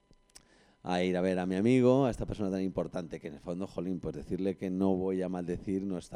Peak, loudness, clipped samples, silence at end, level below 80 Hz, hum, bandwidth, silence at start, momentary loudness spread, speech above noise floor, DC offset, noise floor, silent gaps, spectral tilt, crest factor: -14 dBFS; -32 LUFS; under 0.1%; 0 s; -54 dBFS; none; 11 kHz; 0.85 s; 13 LU; 29 dB; under 0.1%; -60 dBFS; none; -7.5 dB/octave; 18 dB